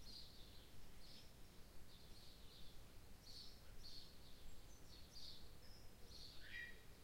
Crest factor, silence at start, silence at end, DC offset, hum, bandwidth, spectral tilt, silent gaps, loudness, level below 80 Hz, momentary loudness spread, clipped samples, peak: 14 dB; 0 s; 0 s; under 0.1%; none; 16.5 kHz; -3 dB/octave; none; -61 LUFS; -64 dBFS; 9 LU; under 0.1%; -42 dBFS